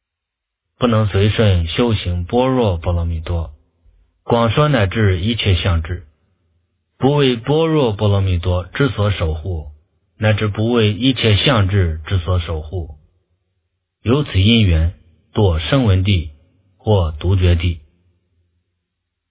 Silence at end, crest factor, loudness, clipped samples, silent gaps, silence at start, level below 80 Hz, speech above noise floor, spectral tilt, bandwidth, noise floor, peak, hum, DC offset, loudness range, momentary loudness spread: 1.5 s; 16 dB; -17 LUFS; under 0.1%; none; 0.8 s; -26 dBFS; 65 dB; -11 dB/octave; 4 kHz; -80 dBFS; 0 dBFS; none; under 0.1%; 2 LU; 11 LU